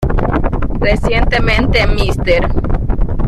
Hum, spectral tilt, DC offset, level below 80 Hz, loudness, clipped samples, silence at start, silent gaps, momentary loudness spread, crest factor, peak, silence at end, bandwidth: none; -6.5 dB/octave; under 0.1%; -16 dBFS; -15 LUFS; under 0.1%; 0 s; none; 6 LU; 10 dB; -2 dBFS; 0 s; 11 kHz